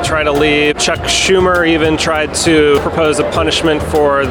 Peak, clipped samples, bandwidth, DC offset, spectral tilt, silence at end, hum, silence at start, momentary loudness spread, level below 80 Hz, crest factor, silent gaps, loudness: 0 dBFS; under 0.1%; 18.5 kHz; under 0.1%; -3.5 dB/octave; 0 s; none; 0 s; 3 LU; -30 dBFS; 12 dB; none; -12 LUFS